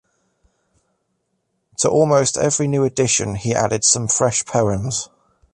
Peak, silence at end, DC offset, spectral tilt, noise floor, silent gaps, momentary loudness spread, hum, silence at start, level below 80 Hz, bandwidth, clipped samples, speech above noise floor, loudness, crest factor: 0 dBFS; 0.5 s; under 0.1%; -4 dB/octave; -71 dBFS; none; 8 LU; none; 1.8 s; -48 dBFS; 11.5 kHz; under 0.1%; 53 dB; -17 LUFS; 20 dB